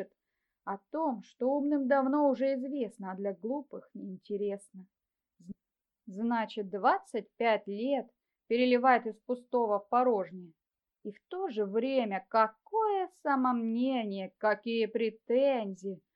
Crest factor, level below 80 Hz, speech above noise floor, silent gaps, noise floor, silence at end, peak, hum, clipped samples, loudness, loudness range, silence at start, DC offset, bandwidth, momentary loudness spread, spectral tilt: 20 dB; -86 dBFS; 59 dB; none; -90 dBFS; 0.15 s; -12 dBFS; none; under 0.1%; -31 LUFS; 8 LU; 0 s; under 0.1%; 11 kHz; 16 LU; -6.5 dB/octave